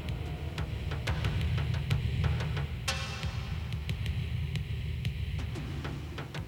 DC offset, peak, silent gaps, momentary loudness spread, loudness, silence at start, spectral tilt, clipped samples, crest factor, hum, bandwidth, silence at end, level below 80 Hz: under 0.1%; -16 dBFS; none; 6 LU; -34 LUFS; 0 s; -5.5 dB/octave; under 0.1%; 16 dB; none; 17.5 kHz; 0 s; -40 dBFS